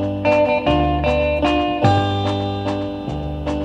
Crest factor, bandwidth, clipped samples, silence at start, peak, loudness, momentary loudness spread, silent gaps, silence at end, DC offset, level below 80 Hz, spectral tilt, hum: 16 dB; 9.2 kHz; under 0.1%; 0 s; -2 dBFS; -19 LUFS; 9 LU; none; 0 s; under 0.1%; -32 dBFS; -7 dB/octave; none